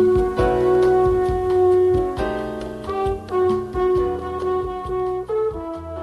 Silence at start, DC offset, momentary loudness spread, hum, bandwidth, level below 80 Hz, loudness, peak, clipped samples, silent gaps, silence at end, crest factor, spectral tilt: 0 s; under 0.1%; 10 LU; none; 11.5 kHz; -36 dBFS; -20 LUFS; -6 dBFS; under 0.1%; none; 0 s; 14 dB; -8 dB/octave